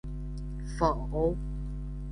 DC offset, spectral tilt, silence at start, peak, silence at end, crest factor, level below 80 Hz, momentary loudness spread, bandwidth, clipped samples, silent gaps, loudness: under 0.1%; -8 dB/octave; 0.05 s; -12 dBFS; 0 s; 20 dB; -36 dBFS; 10 LU; 10.5 kHz; under 0.1%; none; -33 LUFS